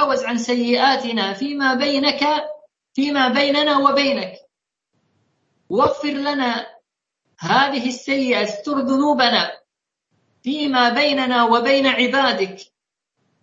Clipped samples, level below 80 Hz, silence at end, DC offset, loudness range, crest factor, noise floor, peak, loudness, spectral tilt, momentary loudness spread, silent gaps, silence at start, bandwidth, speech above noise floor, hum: under 0.1%; -64 dBFS; 0.8 s; under 0.1%; 4 LU; 18 dB; -78 dBFS; -2 dBFS; -18 LUFS; -3.5 dB/octave; 10 LU; none; 0 s; 7.8 kHz; 60 dB; none